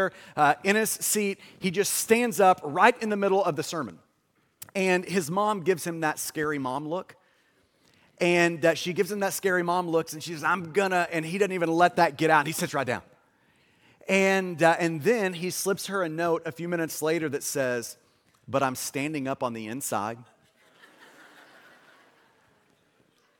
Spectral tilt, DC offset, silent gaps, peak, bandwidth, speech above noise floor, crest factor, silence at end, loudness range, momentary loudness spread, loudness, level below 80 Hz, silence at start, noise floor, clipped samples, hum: -4 dB/octave; under 0.1%; none; -4 dBFS; 17.5 kHz; 44 dB; 24 dB; 3.15 s; 8 LU; 10 LU; -26 LUFS; -72 dBFS; 0 s; -70 dBFS; under 0.1%; none